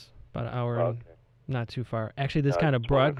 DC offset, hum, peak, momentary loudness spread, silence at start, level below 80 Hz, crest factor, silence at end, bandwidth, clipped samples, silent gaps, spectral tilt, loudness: under 0.1%; none; -12 dBFS; 14 LU; 0 s; -48 dBFS; 16 dB; 0 s; 7.8 kHz; under 0.1%; none; -8 dB/octave; -29 LUFS